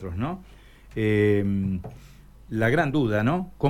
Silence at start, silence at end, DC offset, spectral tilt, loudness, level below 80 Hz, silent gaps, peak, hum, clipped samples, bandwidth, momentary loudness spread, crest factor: 0 s; 0 s; under 0.1%; -8 dB/octave; -25 LUFS; -46 dBFS; none; -8 dBFS; none; under 0.1%; 14 kHz; 13 LU; 16 dB